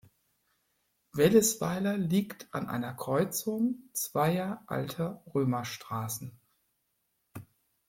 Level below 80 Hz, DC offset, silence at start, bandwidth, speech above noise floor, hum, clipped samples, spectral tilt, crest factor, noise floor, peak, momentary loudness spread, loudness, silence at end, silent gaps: -66 dBFS; under 0.1%; 1.15 s; 16.5 kHz; 48 dB; none; under 0.1%; -5 dB/octave; 22 dB; -78 dBFS; -10 dBFS; 15 LU; -31 LUFS; 0.45 s; none